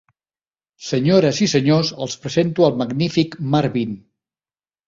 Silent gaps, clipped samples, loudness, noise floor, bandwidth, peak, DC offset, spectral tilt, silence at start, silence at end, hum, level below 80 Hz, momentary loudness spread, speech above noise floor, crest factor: none; under 0.1%; -18 LUFS; under -90 dBFS; 7.8 kHz; -2 dBFS; under 0.1%; -6 dB/octave; 0.8 s; 0.9 s; none; -56 dBFS; 11 LU; over 72 dB; 18 dB